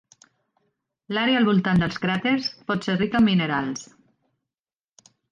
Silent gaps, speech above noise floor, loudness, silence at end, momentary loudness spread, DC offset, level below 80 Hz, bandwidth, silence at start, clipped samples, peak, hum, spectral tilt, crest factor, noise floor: none; over 68 dB; -22 LUFS; 1.45 s; 8 LU; under 0.1%; -54 dBFS; 9.2 kHz; 1.1 s; under 0.1%; -10 dBFS; none; -6 dB/octave; 14 dB; under -90 dBFS